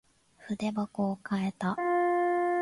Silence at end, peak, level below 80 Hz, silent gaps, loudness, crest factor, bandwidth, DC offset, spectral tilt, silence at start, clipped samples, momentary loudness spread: 0 s; -18 dBFS; -70 dBFS; none; -30 LUFS; 12 dB; 11.5 kHz; under 0.1%; -7 dB/octave; 0.4 s; under 0.1%; 6 LU